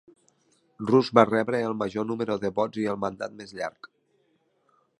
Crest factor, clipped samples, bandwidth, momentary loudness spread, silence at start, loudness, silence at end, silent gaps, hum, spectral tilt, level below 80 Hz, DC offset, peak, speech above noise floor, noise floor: 26 dB; under 0.1%; 11.5 kHz; 15 LU; 0.8 s; -26 LUFS; 1.15 s; none; none; -6.5 dB/octave; -66 dBFS; under 0.1%; -2 dBFS; 44 dB; -69 dBFS